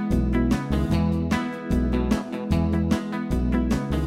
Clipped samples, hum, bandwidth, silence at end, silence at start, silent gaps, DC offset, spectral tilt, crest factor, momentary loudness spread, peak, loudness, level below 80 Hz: under 0.1%; none; 15 kHz; 0 s; 0 s; none; under 0.1%; -7.5 dB/octave; 14 dB; 3 LU; -8 dBFS; -24 LUFS; -30 dBFS